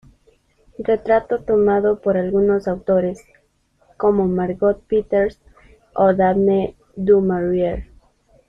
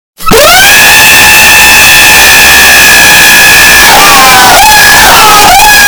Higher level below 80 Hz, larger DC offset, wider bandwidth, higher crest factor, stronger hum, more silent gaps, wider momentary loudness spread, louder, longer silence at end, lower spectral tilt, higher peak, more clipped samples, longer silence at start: second, -44 dBFS vs -22 dBFS; neither; second, 6.4 kHz vs over 20 kHz; first, 16 dB vs 0 dB; neither; neither; first, 9 LU vs 1 LU; second, -18 LUFS vs 2 LUFS; first, 0.65 s vs 0 s; first, -9.5 dB/octave vs -0.5 dB/octave; second, -4 dBFS vs 0 dBFS; second, under 0.1% vs 90%; first, 0.8 s vs 0.2 s